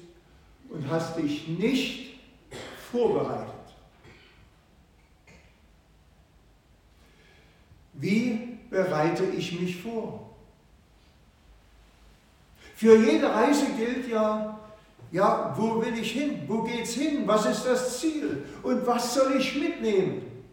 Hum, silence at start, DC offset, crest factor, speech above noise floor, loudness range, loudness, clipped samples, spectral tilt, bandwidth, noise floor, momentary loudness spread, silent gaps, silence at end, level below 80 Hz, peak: none; 0 s; under 0.1%; 22 dB; 33 dB; 10 LU; -26 LUFS; under 0.1%; -5 dB/octave; 17 kHz; -59 dBFS; 15 LU; none; 0.1 s; -60 dBFS; -6 dBFS